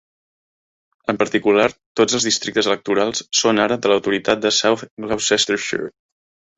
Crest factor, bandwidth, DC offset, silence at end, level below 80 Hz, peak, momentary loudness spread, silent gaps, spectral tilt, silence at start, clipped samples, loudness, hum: 18 dB; 8.4 kHz; under 0.1%; 0.7 s; -58 dBFS; -2 dBFS; 9 LU; 1.86-1.95 s, 4.91-4.97 s; -2.5 dB/octave; 1.1 s; under 0.1%; -18 LUFS; none